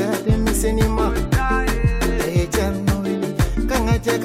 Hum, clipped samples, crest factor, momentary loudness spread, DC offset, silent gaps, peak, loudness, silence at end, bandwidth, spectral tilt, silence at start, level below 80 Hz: none; under 0.1%; 12 dB; 2 LU; under 0.1%; none; -8 dBFS; -20 LUFS; 0 s; 16.5 kHz; -5.5 dB/octave; 0 s; -24 dBFS